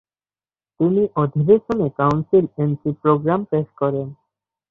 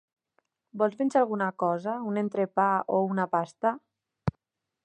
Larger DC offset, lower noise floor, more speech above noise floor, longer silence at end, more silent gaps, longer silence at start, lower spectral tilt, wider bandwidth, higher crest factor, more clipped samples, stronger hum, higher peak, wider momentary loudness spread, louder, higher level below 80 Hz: neither; first, under -90 dBFS vs -80 dBFS; first, over 72 dB vs 53 dB; about the same, 0.55 s vs 0.55 s; neither; about the same, 0.8 s vs 0.75 s; first, -10.5 dB/octave vs -8 dB/octave; second, 6.8 kHz vs 9.4 kHz; about the same, 16 dB vs 18 dB; neither; neither; first, -4 dBFS vs -10 dBFS; second, 6 LU vs 10 LU; first, -19 LUFS vs -28 LUFS; first, -54 dBFS vs -60 dBFS